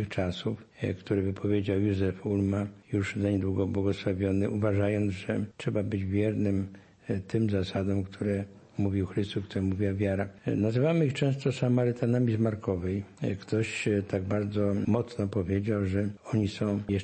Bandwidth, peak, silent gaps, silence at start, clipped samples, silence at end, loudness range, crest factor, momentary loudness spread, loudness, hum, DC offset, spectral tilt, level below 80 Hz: 8.8 kHz; -14 dBFS; none; 0 s; under 0.1%; 0 s; 3 LU; 16 dB; 6 LU; -30 LUFS; none; under 0.1%; -8 dB/octave; -60 dBFS